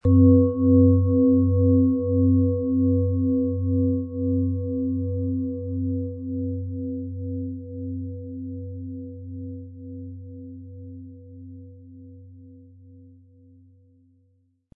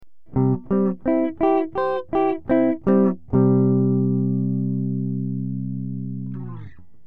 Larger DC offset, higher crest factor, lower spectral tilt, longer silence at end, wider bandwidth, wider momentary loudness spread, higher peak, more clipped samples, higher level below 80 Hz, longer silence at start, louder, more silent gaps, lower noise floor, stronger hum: second, under 0.1% vs 1%; about the same, 18 dB vs 14 dB; first, -16 dB/octave vs -12 dB/octave; first, 2.15 s vs 0.35 s; second, 1.2 kHz vs 4.4 kHz; first, 22 LU vs 11 LU; about the same, -6 dBFS vs -6 dBFS; neither; second, -58 dBFS vs -50 dBFS; about the same, 0.05 s vs 0 s; about the same, -23 LUFS vs -22 LUFS; neither; first, -65 dBFS vs -41 dBFS; neither